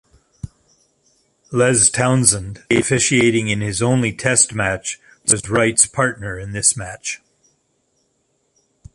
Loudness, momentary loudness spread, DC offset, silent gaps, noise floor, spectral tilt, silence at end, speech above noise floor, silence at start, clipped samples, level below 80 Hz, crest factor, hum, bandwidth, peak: -16 LUFS; 14 LU; under 0.1%; none; -66 dBFS; -3.5 dB/octave; 1.8 s; 49 dB; 0.45 s; under 0.1%; -46 dBFS; 20 dB; none; 12 kHz; 0 dBFS